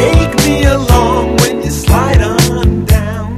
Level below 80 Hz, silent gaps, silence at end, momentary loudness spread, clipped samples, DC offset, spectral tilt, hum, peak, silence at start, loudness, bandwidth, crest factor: -16 dBFS; none; 0 s; 3 LU; 0.6%; under 0.1%; -5.5 dB/octave; none; 0 dBFS; 0 s; -11 LUFS; 14.5 kHz; 10 dB